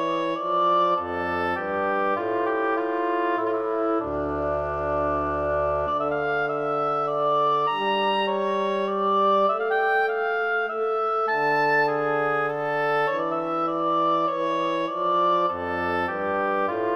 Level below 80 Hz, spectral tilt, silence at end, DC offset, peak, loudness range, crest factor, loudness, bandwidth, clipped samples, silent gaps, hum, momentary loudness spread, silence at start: -52 dBFS; -6.5 dB/octave; 0 s; under 0.1%; -12 dBFS; 3 LU; 12 dB; -24 LUFS; 6.6 kHz; under 0.1%; none; none; 5 LU; 0 s